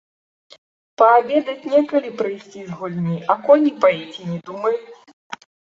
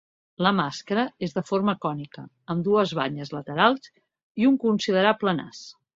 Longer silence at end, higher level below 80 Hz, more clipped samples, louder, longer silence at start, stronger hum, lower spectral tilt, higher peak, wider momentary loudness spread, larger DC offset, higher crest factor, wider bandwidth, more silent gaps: first, 0.45 s vs 0.25 s; about the same, -68 dBFS vs -66 dBFS; neither; first, -19 LUFS vs -24 LUFS; first, 1 s vs 0.4 s; neither; first, -7.5 dB/octave vs -6 dB/octave; about the same, -2 dBFS vs -4 dBFS; first, 20 LU vs 14 LU; neither; about the same, 18 dB vs 22 dB; about the same, 7.4 kHz vs 7.8 kHz; about the same, 5.13-5.30 s vs 4.23-4.35 s